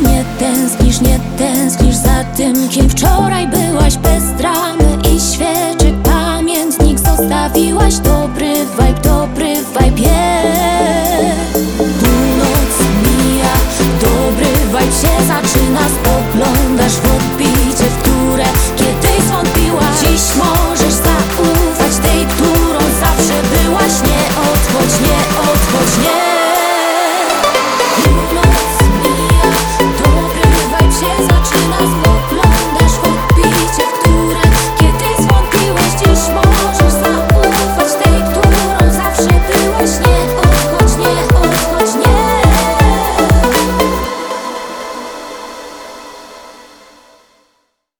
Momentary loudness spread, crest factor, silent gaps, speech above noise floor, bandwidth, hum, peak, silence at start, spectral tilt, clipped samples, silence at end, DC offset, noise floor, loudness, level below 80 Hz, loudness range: 3 LU; 10 dB; none; 51 dB; over 20 kHz; none; 0 dBFS; 0 s; -4.5 dB/octave; under 0.1%; 1.5 s; 0.1%; -62 dBFS; -11 LUFS; -16 dBFS; 2 LU